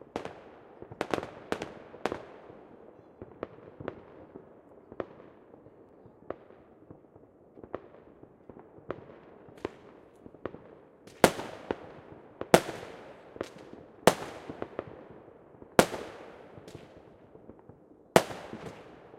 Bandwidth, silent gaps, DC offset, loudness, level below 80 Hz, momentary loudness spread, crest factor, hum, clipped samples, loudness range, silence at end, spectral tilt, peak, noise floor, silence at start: 16 kHz; none; under 0.1%; -32 LUFS; -60 dBFS; 28 LU; 34 dB; none; under 0.1%; 18 LU; 0 s; -4 dB/octave; 0 dBFS; -57 dBFS; 0.15 s